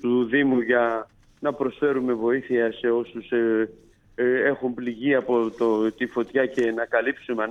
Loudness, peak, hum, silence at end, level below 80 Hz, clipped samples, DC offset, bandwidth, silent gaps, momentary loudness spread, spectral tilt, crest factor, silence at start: -24 LUFS; -8 dBFS; none; 0 s; -60 dBFS; under 0.1%; under 0.1%; 7.6 kHz; none; 7 LU; -7 dB/octave; 16 dB; 0.05 s